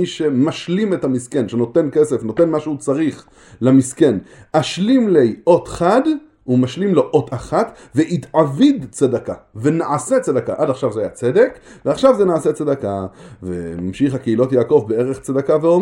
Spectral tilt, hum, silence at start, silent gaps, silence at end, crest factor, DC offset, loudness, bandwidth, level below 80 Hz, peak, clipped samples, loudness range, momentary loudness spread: -6.5 dB/octave; none; 0 s; none; 0 s; 16 dB; under 0.1%; -17 LUFS; 12 kHz; -50 dBFS; 0 dBFS; under 0.1%; 2 LU; 8 LU